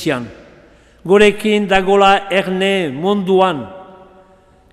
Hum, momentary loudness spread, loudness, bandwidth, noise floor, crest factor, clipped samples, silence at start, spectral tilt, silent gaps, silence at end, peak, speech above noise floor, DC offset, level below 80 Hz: none; 15 LU; -14 LUFS; 13 kHz; -48 dBFS; 16 dB; under 0.1%; 0 s; -5.5 dB/octave; none; 0.9 s; 0 dBFS; 35 dB; under 0.1%; -42 dBFS